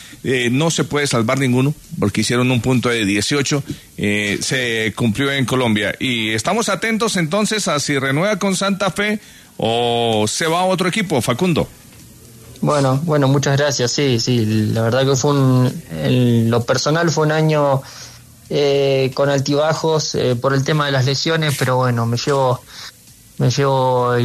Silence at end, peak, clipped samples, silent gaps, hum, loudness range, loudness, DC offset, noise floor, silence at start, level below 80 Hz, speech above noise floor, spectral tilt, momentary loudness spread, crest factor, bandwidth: 0 s; -4 dBFS; under 0.1%; none; none; 2 LU; -17 LUFS; under 0.1%; -41 dBFS; 0 s; -50 dBFS; 25 dB; -5 dB/octave; 5 LU; 14 dB; 13.5 kHz